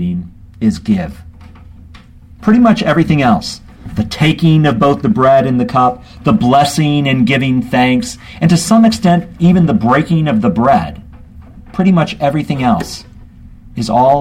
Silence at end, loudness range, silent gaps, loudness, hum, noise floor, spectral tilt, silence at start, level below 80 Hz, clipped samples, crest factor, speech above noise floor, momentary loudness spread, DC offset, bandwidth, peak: 0 s; 4 LU; none; -12 LUFS; none; -37 dBFS; -6.5 dB/octave; 0 s; -36 dBFS; under 0.1%; 12 dB; 26 dB; 11 LU; under 0.1%; 16 kHz; 0 dBFS